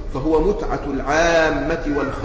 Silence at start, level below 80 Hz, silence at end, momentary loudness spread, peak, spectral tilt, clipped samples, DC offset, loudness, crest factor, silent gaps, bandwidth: 0 s; -30 dBFS; 0 s; 8 LU; -6 dBFS; -5 dB/octave; under 0.1%; under 0.1%; -19 LUFS; 12 dB; none; 8 kHz